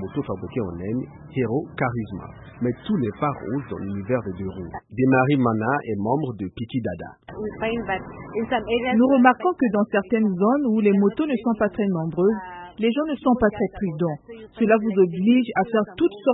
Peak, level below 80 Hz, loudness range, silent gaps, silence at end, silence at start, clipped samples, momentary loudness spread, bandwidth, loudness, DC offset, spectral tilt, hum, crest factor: -4 dBFS; -52 dBFS; 7 LU; none; 0 s; 0 s; under 0.1%; 13 LU; 4 kHz; -23 LUFS; under 0.1%; -12 dB/octave; none; 20 dB